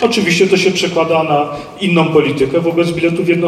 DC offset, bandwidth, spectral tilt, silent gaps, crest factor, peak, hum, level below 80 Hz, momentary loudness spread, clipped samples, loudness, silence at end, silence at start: under 0.1%; 13.5 kHz; -5 dB/octave; none; 12 dB; 0 dBFS; none; -50 dBFS; 4 LU; under 0.1%; -13 LUFS; 0 s; 0 s